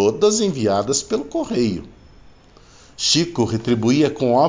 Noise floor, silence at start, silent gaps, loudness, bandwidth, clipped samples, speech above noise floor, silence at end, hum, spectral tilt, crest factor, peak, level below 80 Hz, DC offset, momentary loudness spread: -47 dBFS; 0 s; none; -19 LUFS; 7.8 kHz; under 0.1%; 29 dB; 0 s; none; -4.5 dB/octave; 16 dB; -4 dBFS; -48 dBFS; under 0.1%; 6 LU